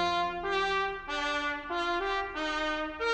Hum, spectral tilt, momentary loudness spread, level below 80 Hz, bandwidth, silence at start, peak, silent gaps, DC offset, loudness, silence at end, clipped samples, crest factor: none; -3 dB/octave; 3 LU; -52 dBFS; 9.8 kHz; 0 s; -16 dBFS; none; under 0.1%; -31 LUFS; 0 s; under 0.1%; 14 dB